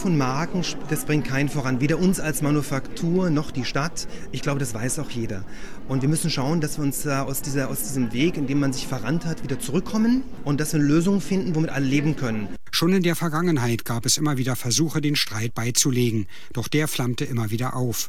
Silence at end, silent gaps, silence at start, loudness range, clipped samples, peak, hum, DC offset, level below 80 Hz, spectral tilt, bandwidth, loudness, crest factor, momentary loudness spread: 0 s; none; 0 s; 4 LU; under 0.1%; -6 dBFS; none; 3%; -42 dBFS; -5 dB/octave; 17.5 kHz; -24 LUFS; 18 dB; 8 LU